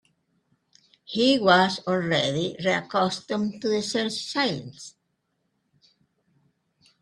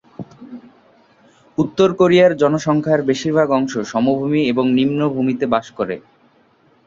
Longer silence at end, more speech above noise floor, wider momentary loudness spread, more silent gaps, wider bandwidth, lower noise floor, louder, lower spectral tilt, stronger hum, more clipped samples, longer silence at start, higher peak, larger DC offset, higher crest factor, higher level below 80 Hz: first, 2.15 s vs 0.85 s; first, 51 dB vs 39 dB; second, 14 LU vs 18 LU; neither; first, 11.5 kHz vs 7.6 kHz; first, -75 dBFS vs -55 dBFS; second, -24 LUFS vs -17 LUFS; second, -4.5 dB/octave vs -6.5 dB/octave; neither; neither; first, 1.1 s vs 0.2 s; about the same, -4 dBFS vs -2 dBFS; neither; first, 22 dB vs 16 dB; second, -66 dBFS vs -56 dBFS